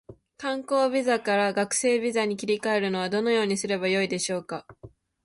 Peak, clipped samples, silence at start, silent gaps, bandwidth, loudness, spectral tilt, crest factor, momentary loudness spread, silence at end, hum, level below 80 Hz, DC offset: -12 dBFS; under 0.1%; 0.1 s; none; 11.5 kHz; -25 LUFS; -3.5 dB/octave; 14 dB; 8 LU; 0.35 s; none; -66 dBFS; under 0.1%